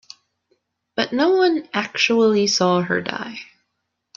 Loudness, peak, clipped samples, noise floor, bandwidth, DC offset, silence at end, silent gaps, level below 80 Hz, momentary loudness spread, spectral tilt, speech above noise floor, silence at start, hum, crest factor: -19 LUFS; -4 dBFS; under 0.1%; -76 dBFS; 7.4 kHz; under 0.1%; 0.75 s; none; -64 dBFS; 14 LU; -4 dB/octave; 57 dB; 0.95 s; none; 18 dB